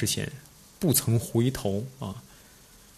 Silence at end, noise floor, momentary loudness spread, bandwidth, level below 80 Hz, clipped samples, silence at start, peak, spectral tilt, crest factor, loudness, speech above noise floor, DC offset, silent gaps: 0.6 s; -53 dBFS; 15 LU; 14 kHz; -54 dBFS; under 0.1%; 0 s; -10 dBFS; -5 dB/octave; 18 dB; -28 LUFS; 26 dB; under 0.1%; none